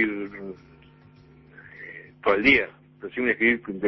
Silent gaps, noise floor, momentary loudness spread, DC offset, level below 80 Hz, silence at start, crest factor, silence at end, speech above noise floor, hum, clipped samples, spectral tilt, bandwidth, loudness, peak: none; -52 dBFS; 22 LU; under 0.1%; -54 dBFS; 0 s; 20 dB; 0 s; 30 dB; none; under 0.1%; -6.5 dB/octave; 6 kHz; -22 LUFS; -6 dBFS